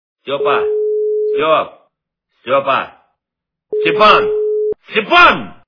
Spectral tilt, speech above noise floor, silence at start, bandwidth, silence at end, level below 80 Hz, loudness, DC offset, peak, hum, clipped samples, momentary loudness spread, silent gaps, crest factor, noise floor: -5 dB/octave; 69 dB; 0.25 s; 5.4 kHz; 0.15 s; -48 dBFS; -13 LUFS; under 0.1%; 0 dBFS; none; 0.2%; 14 LU; none; 14 dB; -82 dBFS